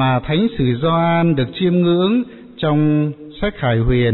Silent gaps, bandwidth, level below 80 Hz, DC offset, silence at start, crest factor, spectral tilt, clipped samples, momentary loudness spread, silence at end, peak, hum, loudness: none; 4.2 kHz; -34 dBFS; 0.6%; 0 s; 10 dB; -6 dB/octave; under 0.1%; 8 LU; 0 s; -6 dBFS; none; -17 LUFS